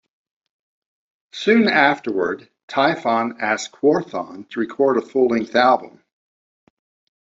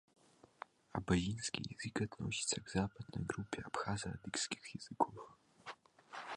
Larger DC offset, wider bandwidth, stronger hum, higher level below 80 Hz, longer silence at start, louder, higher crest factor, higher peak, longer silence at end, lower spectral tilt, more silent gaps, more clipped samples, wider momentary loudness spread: neither; second, 7.8 kHz vs 11.5 kHz; neither; about the same, -64 dBFS vs -60 dBFS; first, 1.35 s vs 0.95 s; first, -19 LUFS vs -41 LUFS; second, 18 dB vs 24 dB; first, -2 dBFS vs -18 dBFS; first, 1.3 s vs 0 s; about the same, -4.5 dB/octave vs -4 dB/octave; first, 2.63-2.68 s vs none; neither; second, 12 LU vs 19 LU